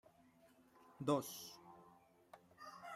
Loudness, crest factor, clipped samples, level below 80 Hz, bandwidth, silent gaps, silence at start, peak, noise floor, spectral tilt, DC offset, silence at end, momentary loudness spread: -44 LUFS; 24 dB; under 0.1%; -86 dBFS; 16 kHz; none; 0.45 s; -24 dBFS; -70 dBFS; -5 dB/octave; under 0.1%; 0 s; 26 LU